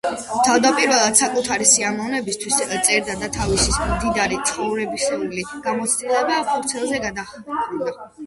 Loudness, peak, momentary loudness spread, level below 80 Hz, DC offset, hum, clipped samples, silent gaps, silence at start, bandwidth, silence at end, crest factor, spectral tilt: -19 LUFS; -2 dBFS; 11 LU; -38 dBFS; under 0.1%; none; under 0.1%; none; 0.05 s; 12 kHz; 0 s; 20 dB; -2 dB/octave